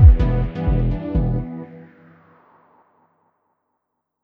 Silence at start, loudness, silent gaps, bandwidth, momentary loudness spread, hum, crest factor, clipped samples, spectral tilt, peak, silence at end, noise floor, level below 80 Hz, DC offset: 0 s; -20 LUFS; none; 4.2 kHz; 18 LU; none; 18 dB; under 0.1%; -11 dB/octave; 0 dBFS; 2.4 s; -76 dBFS; -22 dBFS; under 0.1%